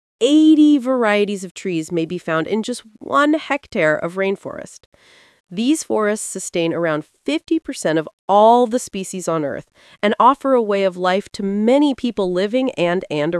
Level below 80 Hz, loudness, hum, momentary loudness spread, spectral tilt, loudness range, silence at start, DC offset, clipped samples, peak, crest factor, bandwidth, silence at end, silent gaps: -60 dBFS; -18 LUFS; none; 11 LU; -5 dB/octave; 5 LU; 0.2 s; under 0.1%; under 0.1%; 0 dBFS; 18 dB; 12 kHz; 0 s; 1.51-1.55 s, 4.86-4.92 s, 5.40-5.44 s, 8.13-8.28 s